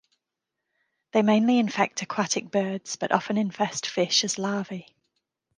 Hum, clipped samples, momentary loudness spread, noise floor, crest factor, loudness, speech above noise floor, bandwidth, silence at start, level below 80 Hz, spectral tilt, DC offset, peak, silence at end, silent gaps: none; under 0.1%; 9 LU; -85 dBFS; 20 dB; -25 LUFS; 60 dB; 10 kHz; 1.15 s; -74 dBFS; -3.5 dB/octave; under 0.1%; -6 dBFS; 0.75 s; none